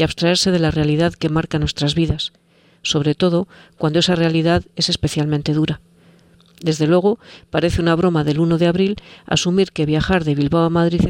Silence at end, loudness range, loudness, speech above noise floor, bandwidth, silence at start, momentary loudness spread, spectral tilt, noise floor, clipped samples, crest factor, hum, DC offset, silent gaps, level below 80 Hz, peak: 0 s; 2 LU; -18 LUFS; 33 dB; 11.5 kHz; 0 s; 7 LU; -5.5 dB/octave; -50 dBFS; under 0.1%; 16 dB; none; under 0.1%; none; -38 dBFS; -2 dBFS